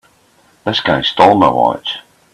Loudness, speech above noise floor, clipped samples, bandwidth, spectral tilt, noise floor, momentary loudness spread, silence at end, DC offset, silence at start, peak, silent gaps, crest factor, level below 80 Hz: -13 LUFS; 40 dB; under 0.1%; 13 kHz; -5.5 dB/octave; -52 dBFS; 15 LU; 0.35 s; under 0.1%; 0.65 s; 0 dBFS; none; 14 dB; -48 dBFS